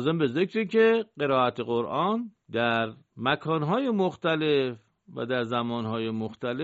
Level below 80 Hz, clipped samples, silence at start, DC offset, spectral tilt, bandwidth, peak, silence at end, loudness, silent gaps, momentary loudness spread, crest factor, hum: -68 dBFS; under 0.1%; 0 s; under 0.1%; -4 dB/octave; 7.6 kHz; -10 dBFS; 0 s; -27 LUFS; none; 9 LU; 16 dB; none